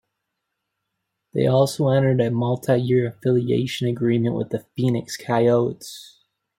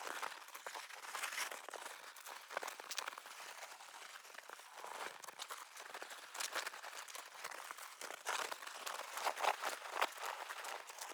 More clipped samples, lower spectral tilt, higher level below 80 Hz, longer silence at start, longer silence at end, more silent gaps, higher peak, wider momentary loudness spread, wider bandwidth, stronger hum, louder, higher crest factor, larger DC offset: neither; first, -7 dB/octave vs 2 dB/octave; first, -60 dBFS vs under -90 dBFS; first, 1.35 s vs 0 s; first, 0.55 s vs 0 s; neither; first, -6 dBFS vs -20 dBFS; second, 8 LU vs 11 LU; second, 16 kHz vs over 20 kHz; neither; first, -21 LUFS vs -46 LUFS; second, 16 dB vs 26 dB; neither